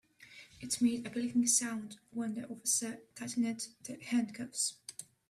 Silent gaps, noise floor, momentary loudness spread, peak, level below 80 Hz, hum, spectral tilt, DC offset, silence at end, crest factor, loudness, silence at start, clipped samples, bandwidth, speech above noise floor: none; -57 dBFS; 18 LU; -16 dBFS; -76 dBFS; none; -2.5 dB/octave; under 0.1%; 0.25 s; 20 dB; -34 LUFS; 0.2 s; under 0.1%; 14.5 kHz; 22 dB